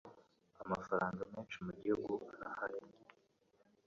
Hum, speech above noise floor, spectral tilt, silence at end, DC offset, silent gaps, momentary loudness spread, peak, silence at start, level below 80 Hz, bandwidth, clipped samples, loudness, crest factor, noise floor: none; 33 dB; -5.5 dB/octave; 0.85 s; under 0.1%; none; 14 LU; -22 dBFS; 0.05 s; -72 dBFS; 7.4 kHz; under 0.1%; -42 LUFS; 22 dB; -75 dBFS